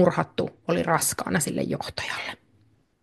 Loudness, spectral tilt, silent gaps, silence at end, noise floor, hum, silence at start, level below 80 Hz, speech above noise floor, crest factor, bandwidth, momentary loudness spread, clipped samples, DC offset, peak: -26 LUFS; -4 dB/octave; none; 0.7 s; -63 dBFS; none; 0 s; -60 dBFS; 37 dB; 22 dB; 12.5 kHz; 9 LU; under 0.1%; under 0.1%; -6 dBFS